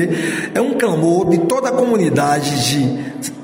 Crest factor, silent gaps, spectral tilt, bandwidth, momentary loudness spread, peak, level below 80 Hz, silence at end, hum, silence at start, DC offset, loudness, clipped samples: 14 dB; none; -5 dB/octave; 16.5 kHz; 5 LU; -2 dBFS; -52 dBFS; 0 s; none; 0 s; under 0.1%; -16 LUFS; under 0.1%